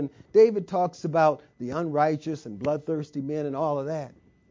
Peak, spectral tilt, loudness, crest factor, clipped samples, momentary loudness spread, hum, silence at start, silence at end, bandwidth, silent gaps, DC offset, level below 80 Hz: -8 dBFS; -7.5 dB/octave; -26 LUFS; 18 dB; under 0.1%; 13 LU; none; 0 s; 0.4 s; 7.6 kHz; none; under 0.1%; -64 dBFS